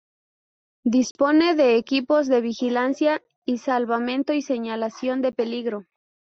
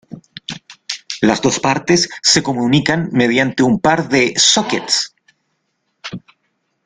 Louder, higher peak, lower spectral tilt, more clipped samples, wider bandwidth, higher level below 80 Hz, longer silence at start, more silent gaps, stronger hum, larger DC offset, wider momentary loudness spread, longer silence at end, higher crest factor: second, -22 LUFS vs -14 LUFS; second, -8 dBFS vs 0 dBFS; first, -4.5 dB/octave vs -3 dB/octave; neither; second, 7.8 kHz vs 11 kHz; second, -68 dBFS vs -52 dBFS; first, 0.85 s vs 0.1 s; first, 1.11-1.15 s, 3.36-3.42 s vs none; neither; neither; second, 10 LU vs 19 LU; second, 0.5 s vs 0.7 s; about the same, 14 dB vs 16 dB